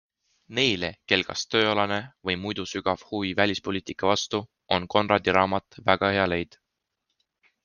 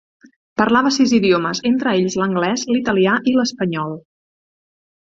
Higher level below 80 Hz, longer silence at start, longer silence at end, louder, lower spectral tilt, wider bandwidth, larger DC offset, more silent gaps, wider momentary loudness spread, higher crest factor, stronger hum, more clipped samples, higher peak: second, -62 dBFS vs -56 dBFS; about the same, 0.5 s vs 0.6 s; first, 1.2 s vs 1.05 s; second, -25 LUFS vs -17 LUFS; about the same, -4 dB/octave vs -5 dB/octave; first, 10 kHz vs 7.8 kHz; neither; neither; about the same, 8 LU vs 8 LU; first, 24 dB vs 16 dB; neither; neither; about the same, -2 dBFS vs -2 dBFS